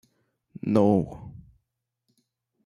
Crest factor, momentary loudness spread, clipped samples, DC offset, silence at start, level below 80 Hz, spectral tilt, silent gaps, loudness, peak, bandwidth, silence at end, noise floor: 20 dB; 23 LU; under 0.1%; under 0.1%; 0.65 s; -58 dBFS; -9.5 dB/octave; none; -24 LUFS; -8 dBFS; 11 kHz; 1.25 s; -81 dBFS